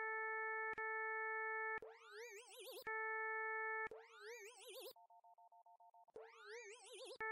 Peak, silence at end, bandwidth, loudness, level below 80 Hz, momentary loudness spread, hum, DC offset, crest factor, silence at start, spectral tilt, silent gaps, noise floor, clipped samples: -36 dBFS; 0 s; 15.5 kHz; -47 LUFS; under -90 dBFS; 15 LU; none; under 0.1%; 12 dB; 0 s; -0.5 dB/octave; none; -68 dBFS; under 0.1%